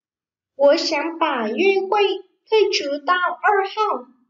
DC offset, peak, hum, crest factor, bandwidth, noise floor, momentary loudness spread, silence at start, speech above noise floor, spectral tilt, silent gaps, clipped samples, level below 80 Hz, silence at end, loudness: under 0.1%; -6 dBFS; none; 14 dB; 7.6 kHz; under -90 dBFS; 5 LU; 0.6 s; over 71 dB; -2.5 dB/octave; none; under 0.1%; -76 dBFS; 0.25 s; -19 LUFS